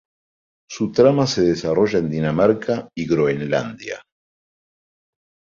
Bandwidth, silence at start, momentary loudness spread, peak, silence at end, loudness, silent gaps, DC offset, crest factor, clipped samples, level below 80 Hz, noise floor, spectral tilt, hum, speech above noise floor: 7.6 kHz; 0.7 s; 15 LU; -2 dBFS; 1.6 s; -19 LUFS; none; under 0.1%; 18 dB; under 0.1%; -52 dBFS; under -90 dBFS; -6 dB/octave; none; over 71 dB